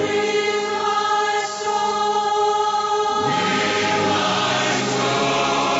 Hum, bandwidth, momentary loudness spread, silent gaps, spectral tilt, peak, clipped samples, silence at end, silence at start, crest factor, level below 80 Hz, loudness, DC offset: none; 8 kHz; 2 LU; none; -3 dB/octave; -8 dBFS; under 0.1%; 0 s; 0 s; 12 dB; -58 dBFS; -19 LUFS; under 0.1%